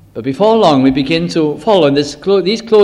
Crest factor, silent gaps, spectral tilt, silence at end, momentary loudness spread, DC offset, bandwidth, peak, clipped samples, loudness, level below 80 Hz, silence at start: 12 dB; none; -6 dB/octave; 0 s; 6 LU; under 0.1%; 11 kHz; 0 dBFS; 0.1%; -12 LUFS; -44 dBFS; 0.15 s